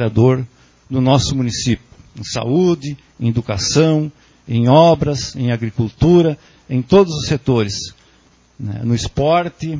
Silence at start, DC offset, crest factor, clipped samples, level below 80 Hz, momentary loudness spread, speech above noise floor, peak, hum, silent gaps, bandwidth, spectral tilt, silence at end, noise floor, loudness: 0 s; under 0.1%; 16 dB; under 0.1%; -38 dBFS; 13 LU; 37 dB; 0 dBFS; none; none; 7.6 kHz; -6 dB/octave; 0 s; -52 dBFS; -16 LUFS